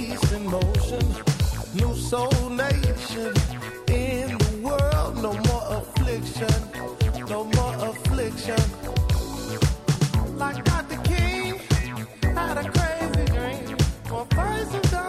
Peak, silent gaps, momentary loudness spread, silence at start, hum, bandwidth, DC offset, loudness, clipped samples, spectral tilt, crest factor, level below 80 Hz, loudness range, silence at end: -6 dBFS; none; 4 LU; 0 s; none; 15 kHz; under 0.1%; -25 LUFS; under 0.1%; -5.5 dB/octave; 16 dB; -30 dBFS; 1 LU; 0 s